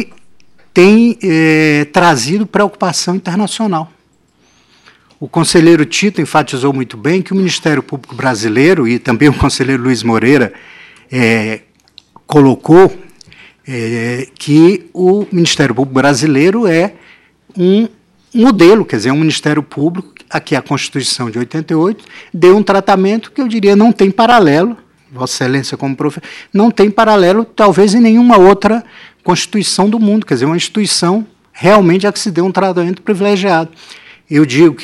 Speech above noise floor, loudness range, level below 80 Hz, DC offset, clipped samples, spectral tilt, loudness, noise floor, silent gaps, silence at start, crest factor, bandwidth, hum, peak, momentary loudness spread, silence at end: 43 dB; 4 LU; -42 dBFS; under 0.1%; 0.8%; -5.5 dB/octave; -11 LUFS; -53 dBFS; none; 0 s; 10 dB; 13 kHz; none; 0 dBFS; 12 LU; 0 s